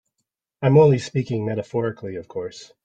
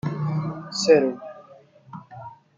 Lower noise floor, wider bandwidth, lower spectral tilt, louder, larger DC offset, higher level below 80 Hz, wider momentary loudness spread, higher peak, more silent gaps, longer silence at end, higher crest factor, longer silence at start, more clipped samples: first, -79 dBFS vs -50 dBFS; about the same, 8.6 kHz vs 9.4 kHz; first, -7.5 dB/octave vs -5.5 dB/octave; about the same, -20 LUFS vs -22 LUFS; neither; about the same, -60 dBFS vs -64 dBFS; second, 17 LU vs 24 LU; about the same, -4 dBFS vs -4 dBFS; neither; about the same, 0.2 s vs 0.25 s; about the same, 18 dB vs 22 dB; first, 0.6 s vs 0.05 s; neither